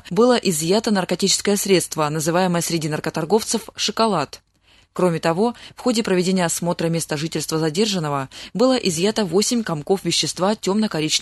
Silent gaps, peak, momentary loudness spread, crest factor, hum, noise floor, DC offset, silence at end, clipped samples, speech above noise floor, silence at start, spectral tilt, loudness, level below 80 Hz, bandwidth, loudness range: none; -4 dBFS; 6 LU; 16 dB; none; -56 dBFS; under 0.1%; 0 s; under 0.1%; 36 dB; 0.05 s; -4 dB/octave; -20 LUFS; -56 dBFS; 12.5 kHz; 2 LU